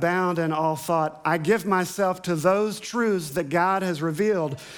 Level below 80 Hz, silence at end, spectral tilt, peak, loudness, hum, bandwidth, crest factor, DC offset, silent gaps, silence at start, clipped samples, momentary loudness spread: -64 dBFS; 0 s; -5.5 dB/octave; -8 dBFS; -24 LUFS; none; 19.5 kHz; 16 dB; under 0.1%; none; 0 s; under 0.1%; 4 LU